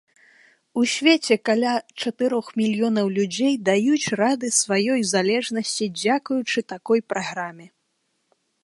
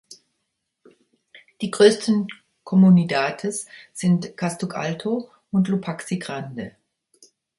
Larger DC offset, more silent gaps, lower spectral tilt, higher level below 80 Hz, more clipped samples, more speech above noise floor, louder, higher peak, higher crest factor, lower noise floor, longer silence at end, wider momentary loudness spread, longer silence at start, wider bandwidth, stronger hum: neither; neither; second, -3.5 dB/octave vs -6 dB/octave; about the same, -70 dBFS vs -66 dBFS; neither; second, 50 dB vs 57 dB; about the same, -22 LUFS vs -21 LUFS; about the same, -2 dBFS vs -2 dBFS; about the same, 20 dB vs 22 dB; second, -72 dBFS vs -77 dBFS; about the same, 0.95 s vs 0.9 s; second, 7 LU vs 17 LU; first, 0.75 s vs 0.1 s; about the same, 11.5 kHz vs 11.5 kHz; neither